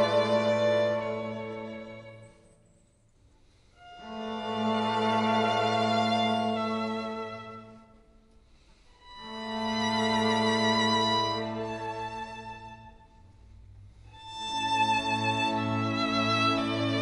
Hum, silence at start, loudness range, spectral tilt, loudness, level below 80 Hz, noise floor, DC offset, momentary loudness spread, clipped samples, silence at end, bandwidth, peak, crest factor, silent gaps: none; 0 s; 10 LU; -4.5 dB/octave; -28 LUFS; -60 dBFS; -63 dBFS; under 0.1%; 18 LU; under 0.1%; 0 s; 11.5 kHz; -14 dBFS; 16 dB; none